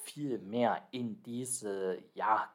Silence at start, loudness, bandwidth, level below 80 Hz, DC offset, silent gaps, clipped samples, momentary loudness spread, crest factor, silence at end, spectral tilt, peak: 0 s; -36 LUFS; 16.5 kHz; under -90 dBFS; under 0.1%; none; under 0.1%; 8 LU; 20 dB; 0.05 s; -4 dB/octave; -16 dBFS